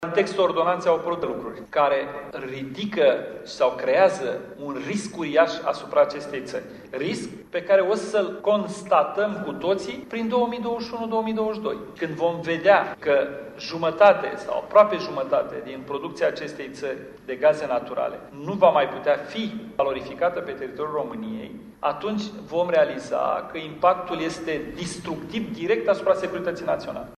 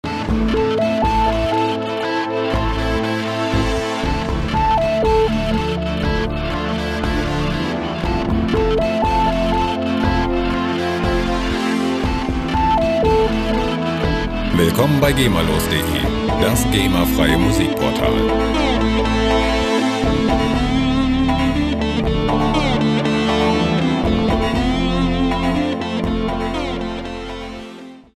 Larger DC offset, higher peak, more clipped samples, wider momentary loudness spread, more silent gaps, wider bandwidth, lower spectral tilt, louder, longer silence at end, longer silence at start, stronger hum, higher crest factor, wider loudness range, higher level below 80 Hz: neither; second, -4 dBFS vs 0 dBFS; neither; first, 13 LU vs 5 LU; neither; second, 12 kHz vs 15.5 kHz; about the same, -5 dB/octave vs -5.5 dB/octave; second, -24 LUFS vs -18 LUFS; about the same, 0.05 s vs 0.15 s; about the same, 0 s vs 0.05 s; neither; about the same, 20 dB vs 18 dB; about the same, 4 LU vs 3 LU; second, -60 dBFS vs -26 dBFS